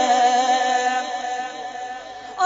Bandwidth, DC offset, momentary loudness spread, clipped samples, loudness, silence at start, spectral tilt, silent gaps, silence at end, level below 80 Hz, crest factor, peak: 7.8 kHz; under 0.1%; 16 LU; under 0.1%; -21 LUFS; 0 s; 0 dB/octave; none; 0 s; -66 dBFS; 14 dB; -6 dBFS